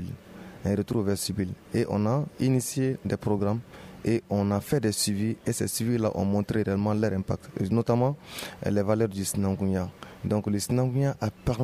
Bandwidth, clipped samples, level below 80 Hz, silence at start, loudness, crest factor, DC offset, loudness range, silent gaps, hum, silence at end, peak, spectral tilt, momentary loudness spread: 15.5 kHz; under 0.1%; -52 dBFS; 0 s; -28 LUFS; 16 dB; under 0.1%; 1 LU; none; none; 0 s; -10 dBFS; -6 dB/octave; 8 LU